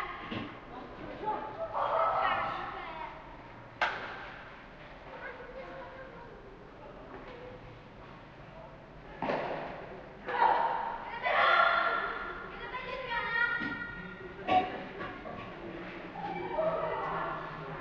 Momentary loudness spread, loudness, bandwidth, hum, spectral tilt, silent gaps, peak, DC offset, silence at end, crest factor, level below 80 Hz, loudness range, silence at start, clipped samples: 21 LU; -33 LUFS; 7.4 kHz; none; -6 dB/octave; none; -12 dBFS; under 0.1%; 0 s; 22 dB; -58 dBFS; 17 LU; 0 s; under 0.1%